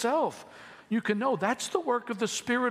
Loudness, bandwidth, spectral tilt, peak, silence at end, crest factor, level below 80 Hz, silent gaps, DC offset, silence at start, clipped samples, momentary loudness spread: -29 LUFS; 15 kHz; -4 dB/octave; -12 dBFS; 0 s; 18 dB; -76 dBFS; none; under 0.1%; 0 s; under 0.1%; 14 LU